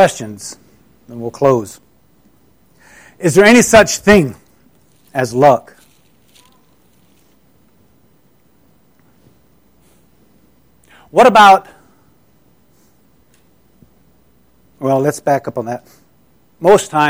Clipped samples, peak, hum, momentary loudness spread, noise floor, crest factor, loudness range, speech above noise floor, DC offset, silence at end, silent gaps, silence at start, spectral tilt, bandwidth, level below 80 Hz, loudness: under 0.1%; 0 dBFS; none; 21 LU; -54 dBFS; 16 dB; 10 LU; 43 dB; 0.2%; 0 s; none; 0 s; -4.5 dB/octave; 16.5 kHz; -46 dBFS; -12 LUFS